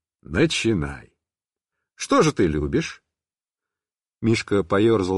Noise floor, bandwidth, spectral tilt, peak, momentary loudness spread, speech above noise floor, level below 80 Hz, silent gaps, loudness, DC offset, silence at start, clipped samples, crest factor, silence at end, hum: under -90 dBFS; 11.5 kHz; -5.5 dB/octave; -6 dBFS; 14 LU; over 69 dB; -42 dBFS; none; -21 LUFS; under 0.1%; 0.3 s; under 0.1%; 18 dB; 0 s; none